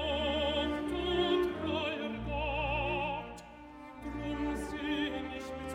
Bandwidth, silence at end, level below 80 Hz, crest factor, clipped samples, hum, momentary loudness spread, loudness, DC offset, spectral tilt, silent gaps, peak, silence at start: 15 kHz; 0 s; -46 dBFS; 16 dB; under 0.1%; none; 14 LU; -34 LUFS; under 0.1%; -5.5 dB/octave; none; -20 dBFS; 0 s